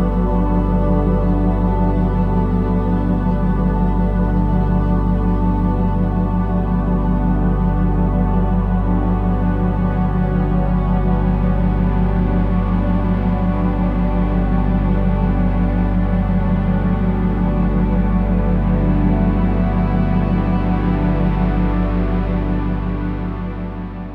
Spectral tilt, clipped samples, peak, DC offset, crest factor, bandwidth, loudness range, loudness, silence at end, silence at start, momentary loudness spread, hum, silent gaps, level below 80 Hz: -11 dB/octave; under 0.1%; -4 dBFS; under 0.1%; 12 dB; 4.2 kHz; 1 LU; -18 LUFS; 0 s; 0 s; 2 LU; 50 Hz at -40 dBFS; none; -20 dBFS